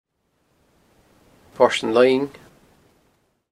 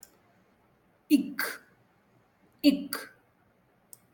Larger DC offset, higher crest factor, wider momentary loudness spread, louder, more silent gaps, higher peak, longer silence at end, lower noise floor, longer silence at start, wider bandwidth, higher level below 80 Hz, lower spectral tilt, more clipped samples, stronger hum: neither; about the same, 22 dB vs 22 dB; second, 8 LU vs 16 LU; first, -19 LUFS vs -29 LUFS; neither; first, -2 dBFS vs -10 dBFS; first, 1.25 s vs 1.05 s; about the same, -68 dBFS vs -67 dBFS; first, 1.6 s vs 1.1 s; second, 12.5 kHz vs 17.5 kHz; first, -64 dBFS vs -74 dBFS; about the same, -4.5 dB/octave vs -4 dB/octave; neither; neither